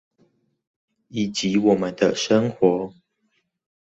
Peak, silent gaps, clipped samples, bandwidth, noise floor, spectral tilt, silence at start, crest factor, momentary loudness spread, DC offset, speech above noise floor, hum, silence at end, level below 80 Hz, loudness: -4 dBFS; none; under 0.1%; 8.2 kHz; -71 dBFS; -5 dB/octave; 1.15 s; 20 dB; 9 LU; under 0.1%; 50 dB; none; 0.95 s; -60 dBFS; -21 LUFS